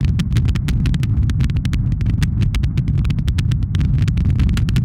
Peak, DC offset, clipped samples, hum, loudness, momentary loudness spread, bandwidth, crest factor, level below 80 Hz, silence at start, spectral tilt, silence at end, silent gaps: -4 dBFS; under 0.1%; under 0.1%; none; -18 LUFS; 2 LU; 13.5 kHz; 12 dB; -22 dBFS; 0 s; -7 dB/octave; 0 s; none